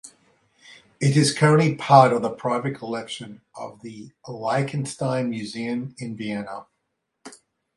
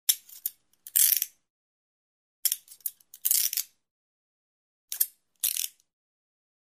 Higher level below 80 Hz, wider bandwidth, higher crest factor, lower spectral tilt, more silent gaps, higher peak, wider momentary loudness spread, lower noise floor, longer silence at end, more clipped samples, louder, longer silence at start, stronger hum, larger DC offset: first, -66 dBFS vs under -90 dBFS; second, 11.5 kHz vs 16 kHz; second, 22 dB vs 28 dB; first, -5.5 dB/octave vs 6.5 dB/octave; second, none vs 1.50-2.43 s, 3.91-4.88 s; first, 0 dBFS vs -4 dBFS; first, 22 LU vs 15 LU; second, -77 dBFS vs under -90 dBFS; second, 0.4 s vs 0.95 s; neither; first, -22 LUFS vs -27 LUFS; about the same, 0.05 s vs 0.1 s; neither; neither